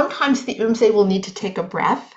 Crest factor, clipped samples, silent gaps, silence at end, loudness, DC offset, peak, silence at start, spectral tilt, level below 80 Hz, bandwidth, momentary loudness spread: 14 dB; under 0.1%; none; 0.1 s; -19 LUFS; under 0.1%; -4 dBFS; 0 s; -5.5 dB/octave; -62 dBFS; 8 kHz; 9 LU